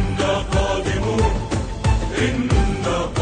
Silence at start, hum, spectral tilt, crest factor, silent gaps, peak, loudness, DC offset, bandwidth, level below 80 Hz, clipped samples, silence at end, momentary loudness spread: 0 s; none; -5.5 dB/octave; 14 dB; none; -6 dBFS; -21 LUFS; under 0.1%; 9.6 kHz; -24 dBFS; under 0.1%; 0 s; 3 LU